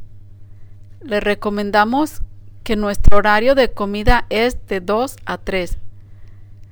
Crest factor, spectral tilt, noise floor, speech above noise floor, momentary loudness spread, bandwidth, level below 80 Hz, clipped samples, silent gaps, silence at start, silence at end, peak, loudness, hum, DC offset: 16 dB; -5.5 dB/octave; -36 dBFS; 23 dB; 15 LU; over 20 kHz; -24 dBFS; under 0.1%; none; 0 s; 0.1 s; 0 dBFS; -18 LUFS; none; under 0.1%